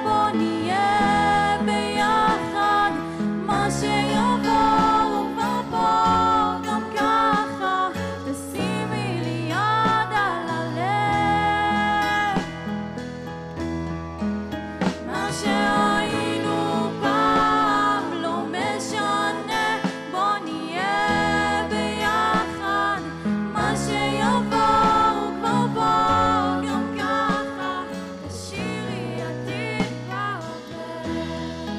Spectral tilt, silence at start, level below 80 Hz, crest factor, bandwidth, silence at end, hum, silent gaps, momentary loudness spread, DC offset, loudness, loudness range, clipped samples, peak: -5 dB/octave; 0 s; -46 dBFS; 10 dB; 15 kHz; 0 s; none; none; 11 LU; under 0.1%; -22 LUFS; 6 LU; under 0.1%; -12 dBFS